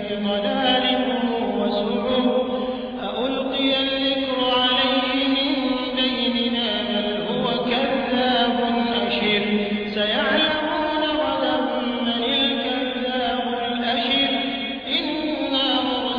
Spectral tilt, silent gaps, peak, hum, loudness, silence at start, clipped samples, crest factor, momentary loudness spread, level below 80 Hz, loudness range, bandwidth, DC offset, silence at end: -6.5 dB/octave; none; -8 dBFS; none; -21 LUFS; 0 s; under 0.1%; 14 dB; 5 LU; -52 dBFS; 2 LU; 5.2 kHz; under 0.1%; 0 s